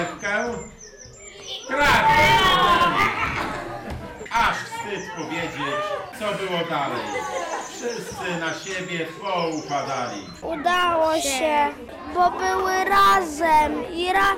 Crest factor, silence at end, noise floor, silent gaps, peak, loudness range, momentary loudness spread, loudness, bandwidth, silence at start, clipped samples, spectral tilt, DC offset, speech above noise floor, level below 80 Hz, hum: 14 dB; 0 s; -42 dBFS; none; -8 dBFS; 8 LU; 16 LU; -22 LUFS; 17 kHz; 0 s; under 0.1%; -3 dB/octave; under 0.1%; 20 dB; -46 dBFS; none